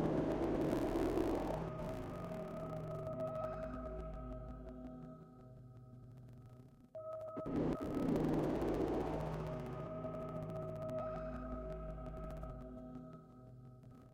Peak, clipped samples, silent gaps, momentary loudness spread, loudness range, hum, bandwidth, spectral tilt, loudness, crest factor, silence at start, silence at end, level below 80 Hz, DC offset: -24 dBFS; under 0.1%; none; 20 LU; 10 LU; none; 16.5 kHz; -8 dB/octave; -42 LUFS; 18 dB; 0 s; 0 s; -54 dBFS; under 0.1%